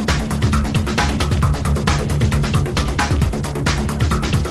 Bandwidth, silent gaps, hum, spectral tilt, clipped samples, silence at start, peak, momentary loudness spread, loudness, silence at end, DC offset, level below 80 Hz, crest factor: 13 kHz; none; none; -5.5 dB/octave; under 0.1%; 0 s; -4 dBFS; 2 LU; -18 LUFS; 0 s; under 0.1%; -22 dBFS; 14 dB